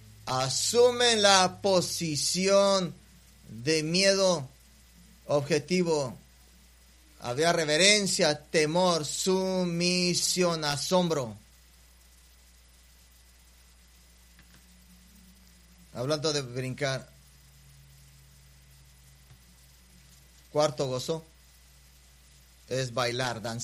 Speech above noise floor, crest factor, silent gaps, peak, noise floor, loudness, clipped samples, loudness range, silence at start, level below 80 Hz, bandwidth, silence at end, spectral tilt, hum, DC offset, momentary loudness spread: 31 dB; 26 dB; none; -4 dBFS; -57 dBFS; -26 LUFS; under 0.1%; 12 LU; 0.25 s; -60 dBFS; 15.5 kHz; 0 s; -3 dB/octave; none; under 0.1%; 14 LU